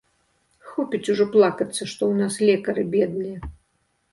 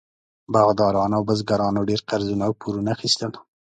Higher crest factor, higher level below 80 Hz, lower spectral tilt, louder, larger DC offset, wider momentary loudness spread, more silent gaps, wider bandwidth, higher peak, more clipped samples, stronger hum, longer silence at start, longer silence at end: about the same, 18 dB vs 20 dB; about the same, -50 dBFS vs -52 dBFS; about the same, -5.5 dB/octave vs -5.5 dB/octave; about the same, -22 LUFS vs -22 LUFS; neither; first, 14 LU vs 7 LU; neither; first, 11.5 kHz vs 9.4 kHz; about the same, -4 dBFS vs -2 dBFS; neither; neither; first, 0.65 s vs 0.5 s; first, 0.6 s vs 0.4 s